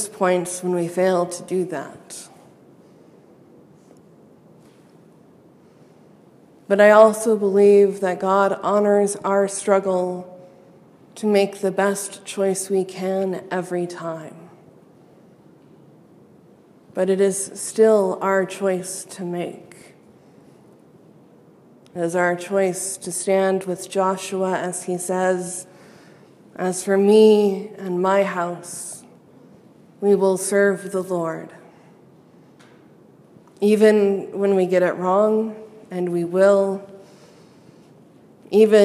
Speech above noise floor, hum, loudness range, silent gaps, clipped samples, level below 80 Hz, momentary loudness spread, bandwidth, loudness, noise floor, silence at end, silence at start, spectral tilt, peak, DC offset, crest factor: 32 dB; none; 11 LU; none; under 0.1%; -76 dBFS; 16 LU; 14.5 kHz; -20 LUFS; -51 dBFS; 0 s; 0 s; -5 dB/octave; 0 dBFS; under 0.1%; 22 dB